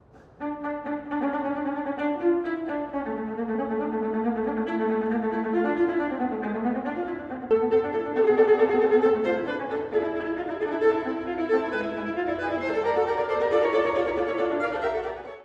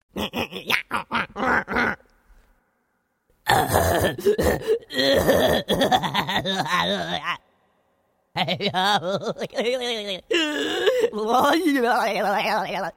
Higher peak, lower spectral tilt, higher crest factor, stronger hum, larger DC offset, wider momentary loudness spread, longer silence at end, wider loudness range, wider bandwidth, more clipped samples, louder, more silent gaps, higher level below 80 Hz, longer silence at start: second, -8 dBFS vs -2 dBFS; first, -7 dB/octave vs -4 dB/octave; second, 16 dB vs 22 dB; neither; neither; about the same, 10 LU vs 8 LU; about the same, 0 s vs 0.05 s; about the same, 5 LU vs 5 LU; second, 6.8 kHz vs 16.5 kHz; neither; second, -26 LUFS vs -22 LUFS; neither; second, -58 dBFS vs -46 dBFS; about the same, 0.15 s vs 0.15 s